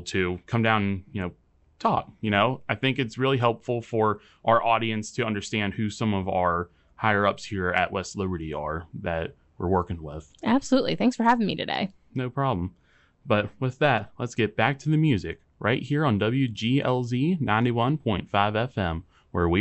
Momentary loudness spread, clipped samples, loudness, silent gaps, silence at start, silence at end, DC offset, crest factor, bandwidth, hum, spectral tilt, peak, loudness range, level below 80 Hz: 9 LU; under 0.1%; -26 LUFS; none; 0 s; 0 s; under 0.1%; 20 dB; 8.2 kHz; none; -6.5 dB/octave; -6 dBFS; 3 LU; -54 dBFS